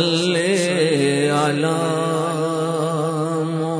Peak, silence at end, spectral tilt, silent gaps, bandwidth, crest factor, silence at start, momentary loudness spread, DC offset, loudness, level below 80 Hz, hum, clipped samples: -6 dBFS; 0 s; -5 dB/octave; none; 11 kHz; 14 dB; 0 s; 4 LU; under 0.1%; -19 LUFS; -66 dBFS; none; under 0.1%